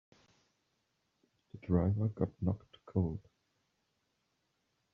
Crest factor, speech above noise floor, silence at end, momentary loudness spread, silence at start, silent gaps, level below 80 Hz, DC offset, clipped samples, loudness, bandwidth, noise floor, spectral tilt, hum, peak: 22 dB; 47 dB; 1.75 s; 12 LU; 1.55 s; none; -62 dBFS; under 0.1%; under 0.1%; -36 LUFS; 3.8 kHz; -81 dBFS; -10.5 dB/octave; none; -16 dBFS